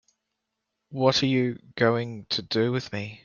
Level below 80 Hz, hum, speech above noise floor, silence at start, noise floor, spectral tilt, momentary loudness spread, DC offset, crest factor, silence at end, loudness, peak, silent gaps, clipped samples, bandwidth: -64 dBFS; none; 56 dB; 0.9 s; -82 dBFS; -5.5 dB/octave; 8 LU; under 0.1%; 20 dB; 0.1 s; -25 LUFS; -6 dBFS; none; under 0.1%; 7.2 kHz